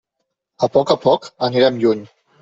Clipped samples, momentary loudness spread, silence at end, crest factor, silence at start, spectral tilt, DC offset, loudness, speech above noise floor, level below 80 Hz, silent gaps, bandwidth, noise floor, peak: under 0.1%; 6 LU; 0.35 s; 16 dB; 0.6 s; -6 dB/octave; under 0.1%; -17 LUFS; 60 dB; -58 dBFS; none; 7.8 kHz; -76 dBFS; -2 dBFS